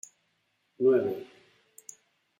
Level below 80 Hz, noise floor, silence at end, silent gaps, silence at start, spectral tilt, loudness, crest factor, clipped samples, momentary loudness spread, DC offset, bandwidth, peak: -80 dBFS; -75 dBFS; 1.15 s; none; 0.8 s; -6 dB/octave; -27 LUFS; 18 dB; under 0.1%; 25 LU; under 0.1%; 16 kHz; -14 dBFS